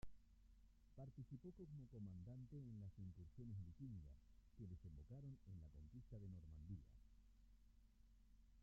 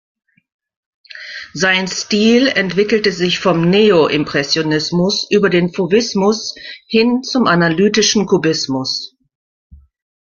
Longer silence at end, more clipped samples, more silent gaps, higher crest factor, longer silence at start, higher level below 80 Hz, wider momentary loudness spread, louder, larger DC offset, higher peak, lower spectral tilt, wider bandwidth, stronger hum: second, 0 s vs 1.25 s; neither; neither; about the same, 16 dB vs 14 dB; second, 0 s vs 1.15 s; second, -68 dBFS vs -52 dBFS; second, 5 LU vs 10 LU; second, -60 LUFS vs -14 LUFS; neither; second, -44 dBFS vs 0 dBFS; first, -11 dB/octave vs -4.5 dB/octave; about the same, 7.2 kHz vs 7.4 kHz; neither